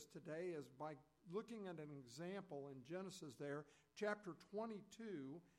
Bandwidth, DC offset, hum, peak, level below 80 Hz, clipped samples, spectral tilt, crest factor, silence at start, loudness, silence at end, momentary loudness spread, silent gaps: 15.5 kHz; under 0.1%; none; -32 dBFS; -90 dBFS; under 0.1%; -5.5 dB/octave; 20 dB; 0 s; -52 LUFS; 0.1 s; 7 LU; none